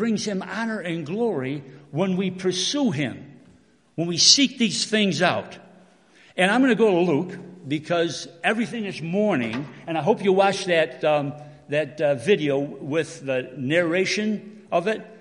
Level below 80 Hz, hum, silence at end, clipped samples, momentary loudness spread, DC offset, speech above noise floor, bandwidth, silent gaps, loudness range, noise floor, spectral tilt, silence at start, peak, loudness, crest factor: -70 dBFS; none; 0 s; under 0.1%; 12 LU; under 0.1%; 33 dB; 11 kHz; none; 5 LU; -56 dBFS; -4 dB/octave; 0 s; -2 dBFS; -22 LUFS; 22 dB